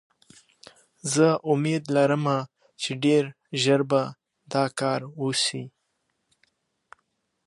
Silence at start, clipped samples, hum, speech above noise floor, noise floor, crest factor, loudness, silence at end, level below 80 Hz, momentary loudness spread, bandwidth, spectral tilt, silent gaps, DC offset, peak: 1.05 s; under 0.1%; none; 52 dB; -76 dBFS; 20 dB; -24 LUFS; 1.8 s; -76 dBFS; 12 LU; 11.5 kHz; -5 dB/octave; none; under 0.1%; -6 dBFS